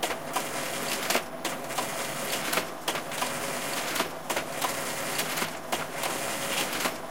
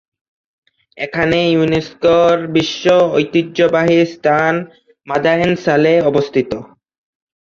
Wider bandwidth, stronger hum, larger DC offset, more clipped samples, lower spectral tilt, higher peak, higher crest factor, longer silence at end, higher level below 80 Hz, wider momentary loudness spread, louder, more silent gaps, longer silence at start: first, 17 kHz vs 7.4 kHz; neither; first, 0.6% vs under 0.1%; neither; second, -1.5 dB/octave vs -6 dB/octave; second, -10 dBFS vs -2 dBFS; first, 20 dB vs 14 dB; second, 0 s vs 0.75 s; second, -68 dBFS vs -50 dBFS; second, 4 LU vs 10 LU; second, -30 LUFS vs -14 LUFS; neither; second, 0 s vs 0.95 s